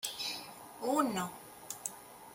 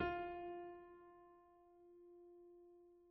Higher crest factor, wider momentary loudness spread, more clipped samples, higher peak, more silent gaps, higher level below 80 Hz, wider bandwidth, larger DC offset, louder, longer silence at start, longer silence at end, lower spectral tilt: about the same, 22 dB vs 22 dB; second, 17 LU vs 20 LU; neither; first, -16 dBFS vs -28 dBFS; neither; second, -76 dBFS vs -70 dBFS; first, 17 kHz vs 5.2 kHz; neither; first, -37 LUFS vs -52 LUFS; about the same, 0 s vs 0 s; about the same, 0 s vs 0 s; second, -3 dB/octave vs -4.5 dB/octave